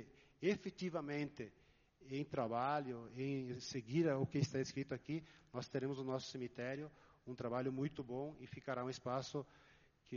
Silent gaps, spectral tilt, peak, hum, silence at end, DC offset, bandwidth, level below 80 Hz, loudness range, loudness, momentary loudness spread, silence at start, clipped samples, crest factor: none; -6 dB/octave; -24 dBFS; none; 0 s; under 0.1%; 7.2 kHz; -74 dBFS; 4 LU; -43 LUFS; 11 LU; 0 s; under 0.1%; 20 dB